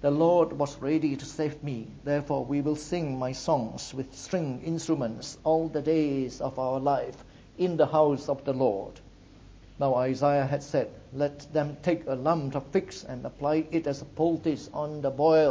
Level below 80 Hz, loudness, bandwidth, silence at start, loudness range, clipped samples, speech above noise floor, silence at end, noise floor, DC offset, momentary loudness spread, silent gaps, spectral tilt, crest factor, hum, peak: -56 dBFS; -28 LUFS; 8 kHz; 0 s; 3 LU; under 0.1%; 24 dB; 0 s; -51 dBFS; under 0.1%; 10 LU; none; -6.5 dB/octave; 18 dB; none; -10 dBFS